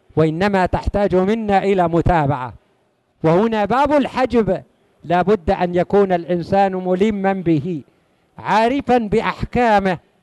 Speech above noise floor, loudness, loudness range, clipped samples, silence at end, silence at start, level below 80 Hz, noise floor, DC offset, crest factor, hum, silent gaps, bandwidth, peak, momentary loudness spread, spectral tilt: 45 dB; -17 LUFS; 1 LU; under 0.1%; 0.25 s; 0.15 s; -36 dBFS; -62 dBFS; under 0.1%; 14 dB; none; none; 11.5 kHz; -2 dBFS; 6 LU; -7.5 dB/octave